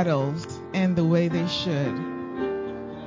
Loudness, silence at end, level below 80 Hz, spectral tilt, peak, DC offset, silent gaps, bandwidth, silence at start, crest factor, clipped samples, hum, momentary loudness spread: -26 LUFS; 0 s; -54 dBFS; -7 dB/octave; -10 dBFS; under 0.1%; none; 7.6 kHz; 0 s; 16 dB; under 0.1%; none; 10 LU